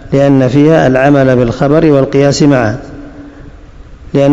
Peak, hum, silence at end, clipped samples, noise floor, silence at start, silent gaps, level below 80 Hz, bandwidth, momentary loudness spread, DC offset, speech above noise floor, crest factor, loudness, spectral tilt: 0 dBFS; none; 0 s; 3%; -32 dBFS; 0 s; none; -32 dBFS; 7.8 kHz; 9 LU; 0.7%; 24 dB; 10 dB; -8 LUFS; -7 dB/octave